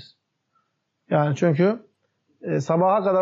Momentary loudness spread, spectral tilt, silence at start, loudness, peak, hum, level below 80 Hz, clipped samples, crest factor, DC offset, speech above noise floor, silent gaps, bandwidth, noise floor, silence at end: 10 LU; -7.5 dB/octave; 1.1 s; -22 LUFS; -8 dBFS; none; -74 dBFS; under 0.1%; 14 dB; under 0.1%; 53 dB; none; 7.6 kHz; -73 dBFS; 0 s